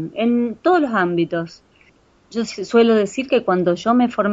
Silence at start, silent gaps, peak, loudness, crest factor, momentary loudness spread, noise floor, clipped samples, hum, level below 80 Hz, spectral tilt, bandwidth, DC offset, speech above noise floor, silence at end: 0 s; none; -4 dBFS; -18 LUFS; 16 dB; 10 LU; -54 dBFS; under 0.1%; none; -60 dBFS; -6 dB/octave; 7.8 kHz; under 0.1%; 37 dB; 0 s